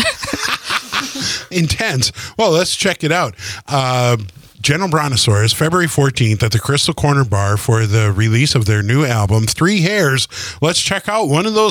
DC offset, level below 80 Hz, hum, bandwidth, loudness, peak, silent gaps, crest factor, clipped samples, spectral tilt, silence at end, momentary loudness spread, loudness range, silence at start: under 0.1%; -42 dBFS; none; 18.5 kHz; -15 LUFS; -2 dBFS; none; 12 dB; under 0.1%; -4.5 dB/octave; 0 s; 5 LU; 2 LU; 0 s